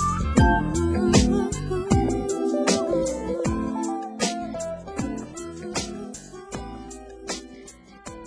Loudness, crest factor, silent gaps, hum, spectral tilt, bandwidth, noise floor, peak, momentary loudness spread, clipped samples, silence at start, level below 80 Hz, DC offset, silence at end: -24 LUFS; 22 dB; none; none; -5 dB/octave; 11 kHz; -46 dBFS; -2 dBFS; 19 LU; under 0.1%; 0 s; -34 dBFS; under 0.1%; 0 s